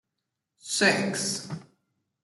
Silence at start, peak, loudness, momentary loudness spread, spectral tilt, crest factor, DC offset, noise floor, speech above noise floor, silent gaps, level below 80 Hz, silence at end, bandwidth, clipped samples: 0.65 s; -8 dBFS; -25 LUFS; 19 LU; -2.5 dB/octave; 22 dB; under 0.1%; -84 dBFS; 57 dB; none; -74 dBFS; 0.6 s; 12 kHz; under 0.1%